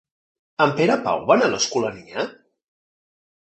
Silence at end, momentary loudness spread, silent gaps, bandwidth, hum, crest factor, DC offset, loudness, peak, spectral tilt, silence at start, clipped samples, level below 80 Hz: 1.2 s; 11 LU; none; 8.4 kHz; none; 20 dB; under 0.1%; -21 LUFS; -2 dBFS; -4 dB/octave; 0.6 s; under 0.1%; -62 dBFS